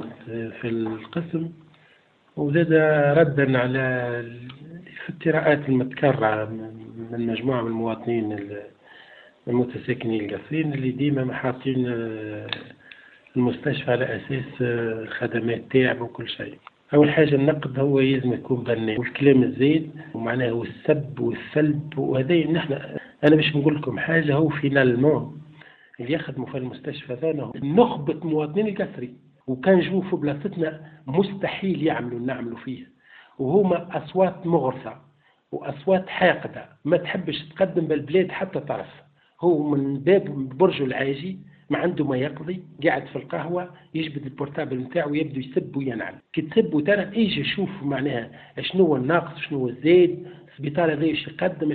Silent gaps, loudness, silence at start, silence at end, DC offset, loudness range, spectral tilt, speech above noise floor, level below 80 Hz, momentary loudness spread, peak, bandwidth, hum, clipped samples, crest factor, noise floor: none; -23 LUFS; 0 s; 0 s; under 0.1%; 6 LU; -10 dB/octave; 36 dB; -60 dBFS; 14 LU; -4 dBFS; 4.6 kHz; none; under 0.1%; 20 dB; -59 dBFS